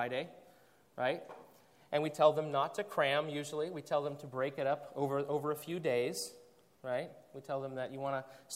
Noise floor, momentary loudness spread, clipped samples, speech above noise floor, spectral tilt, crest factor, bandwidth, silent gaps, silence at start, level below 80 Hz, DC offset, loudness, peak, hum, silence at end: -65 dBFS; 13 LU; under 0.1%; 29 dB; -4.5 dB/octave; 22 dB; 16 kHz; none; 0 s; -84 dBFS; under 0.1%; -36 LUFS; -14 dBFS; none; 0 s